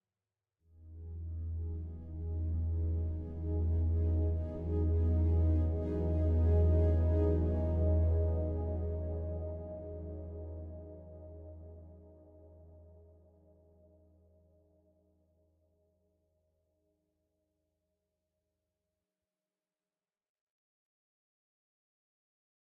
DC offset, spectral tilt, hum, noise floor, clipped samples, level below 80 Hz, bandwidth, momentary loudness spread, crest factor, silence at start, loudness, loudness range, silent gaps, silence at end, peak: under 0.1%; -12 dB/octave; none; under -90 dBFS; under 0.1%; -44 dBFS; 2.2 kHz; 20 LU; 16 dB; 0.8 s; -34 LUFS; 18 LU; none; 9.85 s; -20 dBFS